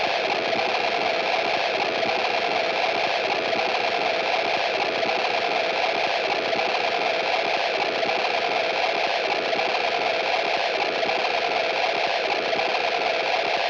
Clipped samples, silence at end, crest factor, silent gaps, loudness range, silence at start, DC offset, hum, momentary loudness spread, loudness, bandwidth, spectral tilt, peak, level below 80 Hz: under 0.1%; 0 s; 14 dB; none; 0 LU; 0 s; under 0.1%; none; 1 LU; -23 LUFS; 8.6 kHz; -2.5 dB/octave; -10 dBFS; -68 dBFS